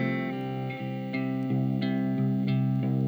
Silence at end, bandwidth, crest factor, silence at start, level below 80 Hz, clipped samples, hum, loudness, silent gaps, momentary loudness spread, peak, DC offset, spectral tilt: 0 s; over 20 kHz; 10 dB; 0 s; -68 dBFS; under 0.1%; none; -29 LUFS; none; 7 LU; -18 dBFS; under 0.1%; -9.5 dB/octave